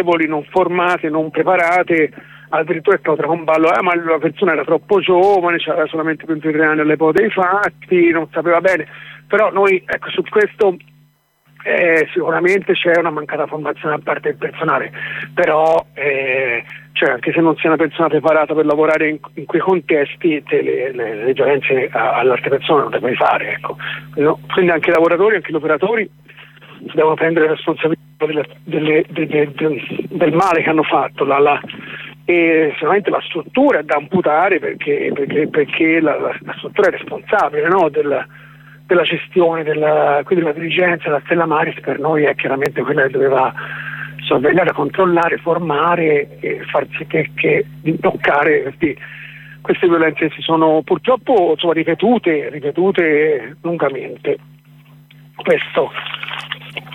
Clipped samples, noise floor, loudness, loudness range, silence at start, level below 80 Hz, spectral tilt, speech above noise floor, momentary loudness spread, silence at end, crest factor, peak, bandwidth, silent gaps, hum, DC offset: under 0.1%; -55 dBFS; -16 LUFS; 3 LU; 0 s; -58 dBFS; -7 dB/octave; 39 dB; 9 LU; 0 s; 14 dB; -2 dBFS; 10 kHz; none; none; under 0.1%